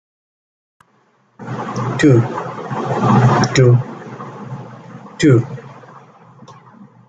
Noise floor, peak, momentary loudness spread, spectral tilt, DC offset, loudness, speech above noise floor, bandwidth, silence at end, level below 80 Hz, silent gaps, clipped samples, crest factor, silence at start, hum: -57 dBFS; -2 dBFS; 21 LU; -7 dB/octave; under 0.1%; -15 LUFS; 45 dB; 9 kHz; 0.25 s; -50 dBFS; none; under 0.1%; 16 dB; 1.4 s; none